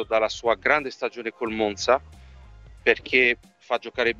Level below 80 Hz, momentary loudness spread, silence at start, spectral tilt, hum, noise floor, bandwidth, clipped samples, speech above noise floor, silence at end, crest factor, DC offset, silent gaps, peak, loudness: -52 dBFS; 11 LU; 0 s; -3.5 dB/octave; none; -46 dBFS; 8.2 kHz; under 0.1%; 22 dB; 0 s; 22 dB; under 0.1%; none; -4 dBFS; -23 LUFS